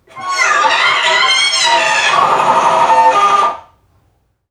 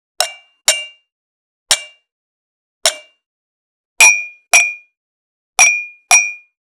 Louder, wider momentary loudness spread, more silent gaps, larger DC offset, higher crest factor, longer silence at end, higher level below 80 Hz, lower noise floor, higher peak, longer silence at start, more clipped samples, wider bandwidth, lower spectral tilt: about the same, -10 LUFS vs -12 LUFS; second, 5 LU vs 13 LU; second, none vs 1.12-1.66 s, 2.12-2.81 s, 3.26-3.96 s, 4.97-5.53 s; neither; second, 12 dB vs 18 dB; first, 0.9 s vs 0.35 s; about the same, -60 dBFS vs -62 dBFS; second, -58 dBFS vs under -90 dBFS; about the same, 0 dBFS vs 0 dBFS; about the same, 0.15 s vs 0.2 s; neither; second, 13 kHz vs over 20 kHz; first, 0 dB/octave vs 3.5 dB/octave